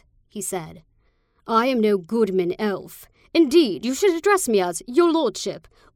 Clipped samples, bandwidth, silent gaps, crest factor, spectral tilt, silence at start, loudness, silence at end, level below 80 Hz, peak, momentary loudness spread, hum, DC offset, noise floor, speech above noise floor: under 0.1%; 17 kHz; none; 18 dB; -4 dB/octave; 0.35 s; -21 LUFS; 0.35 s; -60 dBFS; -4 dBFS; 14 LU; none; under 0.1%; -63 dBFS; 42 dB